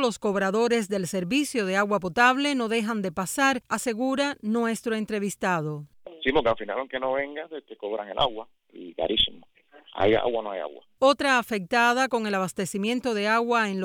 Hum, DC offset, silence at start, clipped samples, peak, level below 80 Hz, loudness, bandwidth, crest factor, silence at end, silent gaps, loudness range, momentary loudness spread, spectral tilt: none; under 0.1%; 0 s; under 0.1%; -6 dBFS; -54 dBFS; -25 LUFS; 19.5 kHz; 20 dB; 0 s; none; 4 LU; 12 LU; -4 dB/octave